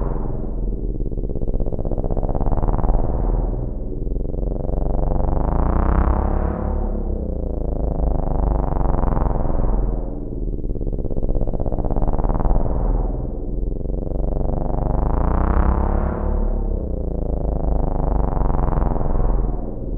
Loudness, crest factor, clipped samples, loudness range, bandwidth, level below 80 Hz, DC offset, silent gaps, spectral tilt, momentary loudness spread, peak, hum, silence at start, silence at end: -24 LUFS; 16 dB; under 0.1%; 2 LU; 2.4 kHz; -20 dBFS; under 0.1%; none; -12.5 dB/octave; 7 LU; -4 dBFS; none; 0 s; 0 s